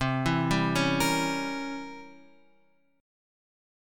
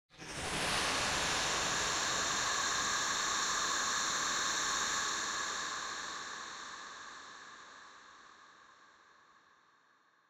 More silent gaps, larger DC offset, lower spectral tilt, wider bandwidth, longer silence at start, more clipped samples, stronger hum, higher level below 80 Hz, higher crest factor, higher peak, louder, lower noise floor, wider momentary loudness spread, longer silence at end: neither; neither; first, -5 dB/octave vs 0 dB/octave; about the same, 17.5 kHz vs 16 kHz; second, 0 s vs 0.15 s; neither; neither; first, -50 dBFS vs -62 dBFS; about the same, 20 dB vs 16 dB; first, -12 dBFS vs -22 dBFS; first, -27 LUFS vs -33 LUFS; about the same, -68 dBFS vs -70 dBFS; about the same, 15 LU vs 17 LU; second, 1 s vs 1.6 s